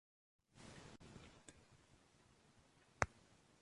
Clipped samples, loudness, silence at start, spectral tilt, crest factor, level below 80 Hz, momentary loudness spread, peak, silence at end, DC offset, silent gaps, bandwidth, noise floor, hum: under 0.1%; -48 LUFS; 0.55 s; -4 dB/octave; 42 dB; -68 dBFS; 25 LU; -12 dBFS; 0.05 s; under 0.1%; none; 11.5 kHz; -72 dBFS; none